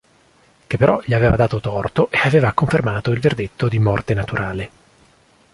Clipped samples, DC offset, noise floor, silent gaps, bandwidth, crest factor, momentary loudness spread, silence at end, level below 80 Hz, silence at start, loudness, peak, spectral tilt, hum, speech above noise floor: under 0.1%; under 0.1%; -54 dBFS; none; 11.5 kHz; 18 dB; 8 LU; 0.85 s; -38 dBFS; 0.7 s; -18 LUFS; 0 dBFS; -7.5 dB/octave; none; 37 dB